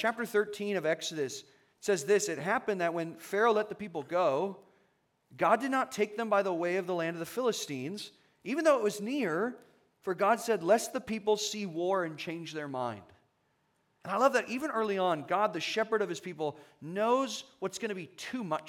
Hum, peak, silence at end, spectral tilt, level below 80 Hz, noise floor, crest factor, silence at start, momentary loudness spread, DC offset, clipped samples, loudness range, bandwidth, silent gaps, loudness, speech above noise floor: none; -12 dBFS; 0 s; -4 dB/octave; -80 dBFS; -75 dBFS; 20 dB; 0 s; 11 LU; under 0.1%; under 0.1%; 3 LU; 17.5 kHz; none; -32 LUFS; 43 dB